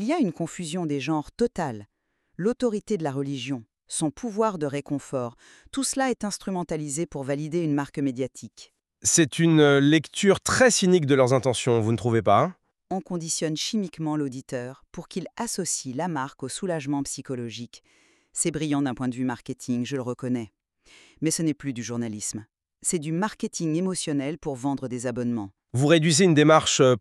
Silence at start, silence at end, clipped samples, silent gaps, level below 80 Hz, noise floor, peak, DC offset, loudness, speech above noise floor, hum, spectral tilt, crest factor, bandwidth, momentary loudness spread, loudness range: 0 s; 0 s; under 0.1%; none; -60 dBFS; -56 dBFS; -4 dBFS; under 0.1%; -25 LUFS; 32 dB; none; -4.5 dB/octave; 22 dB; 13.5 kHz; 14 LU; 9 LU